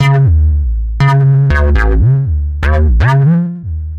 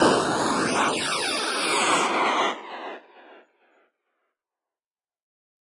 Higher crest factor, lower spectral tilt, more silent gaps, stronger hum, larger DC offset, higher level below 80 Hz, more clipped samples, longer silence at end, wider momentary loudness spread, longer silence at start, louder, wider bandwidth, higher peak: second, 10 dB vs 20 dB; first, -8.5 dB/octave vs -2.5 dB/octave; neither; neither; neither; first, -14 dBFS vs -64 dBFS; neither; second, 0 s vs 2.4 s; second, 7 LU vs 16 LU; about the same, 0 s vs 0 s; first, -11 LUFS vs -23 LUFS; second, 6.6 kHz vs 11.5 kHz; first, 0 dBFS vs -6 dBFS